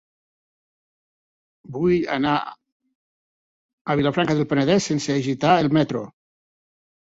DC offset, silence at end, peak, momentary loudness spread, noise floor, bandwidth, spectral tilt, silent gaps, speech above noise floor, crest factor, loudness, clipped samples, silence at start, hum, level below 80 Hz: under 0.1%; 1 s; -4 dBFS; 14 LU; under -90 dBFS; 8 kHz; -6 dB/octave; 2.72-2.80 s, 2.95-3.85 s; over 70 dB; 20 dB; -21 LUFS; under 0.1%; 1.7 s; none; -56 dBFS